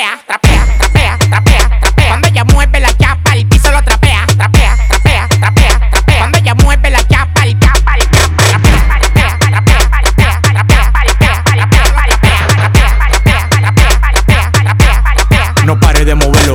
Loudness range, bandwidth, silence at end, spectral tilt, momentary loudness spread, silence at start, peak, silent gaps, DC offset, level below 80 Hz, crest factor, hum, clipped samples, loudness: 0 LU; 16.5 kHz; 0 s; -4.5 dB/octave; 2 LU; 0 s; 0 dBFS; none; 0.8%; -10 dBFS; 6 dB; none; 0.5%; -8 LUFS